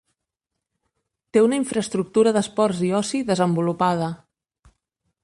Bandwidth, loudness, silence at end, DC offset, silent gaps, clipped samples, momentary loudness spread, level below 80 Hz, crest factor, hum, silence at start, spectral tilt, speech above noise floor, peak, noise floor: 11.5 kHz; -21 LUFS; 1.1 s; under 0.1%; none; under 0.1%; 6 LU; -62 dBFS; 18 dB; none; 1.35 s; -5.5 dB/octave; 62 dB; -6 dBFS; -83 dBFS